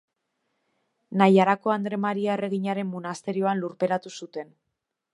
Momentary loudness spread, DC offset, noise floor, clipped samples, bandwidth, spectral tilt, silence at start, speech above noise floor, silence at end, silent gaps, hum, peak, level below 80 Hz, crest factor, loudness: 18 LU; under 0.1%; -82 dBFS; under 0.1%; 11 kHz; -7 dB/octave; 1.1 s; 57 dB; 0.7 s; none; none; -2 dBFS; -78 dBFS; 24 dB; -25 LUFS